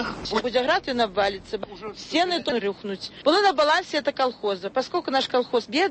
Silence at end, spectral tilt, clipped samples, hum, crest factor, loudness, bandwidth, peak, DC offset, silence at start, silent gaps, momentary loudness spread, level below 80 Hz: 0 s; -3.5 dB/octave; under 0.1%; none; 16 dB; -24 LUFS; 8.8 kHz; -8 dBFS; under 0.1%; 0 s; none; 13 LU; -54 dBFS